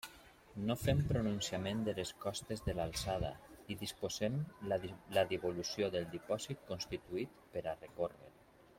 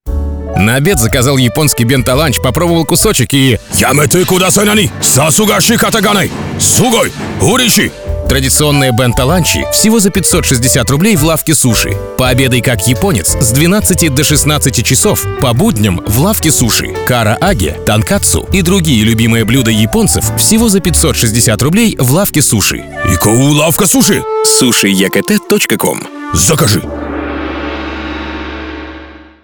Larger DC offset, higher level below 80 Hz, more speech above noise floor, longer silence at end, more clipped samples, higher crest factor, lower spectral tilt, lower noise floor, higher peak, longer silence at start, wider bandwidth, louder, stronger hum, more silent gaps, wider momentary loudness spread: neither; second, -56 dBFS vs -26 dBFS; about the same, 21 dB vs 22 dB; first, 0.45 s vs 0.2 s; neither; first, 18 dB vs 10 dB; about the same, -5 dB/octave vs -4 dB/octave; first, -60 dBFS vs -31 dBFS; second, -20 dBFS vs 0 dBFS; about the same, 0.05 s vs 0.05 s; second, 16.5 kHz vs over 20 kHz; second, -40 LUFS vs -9 LUFS; neither; neither; about the same, 9 LU vs 8 LU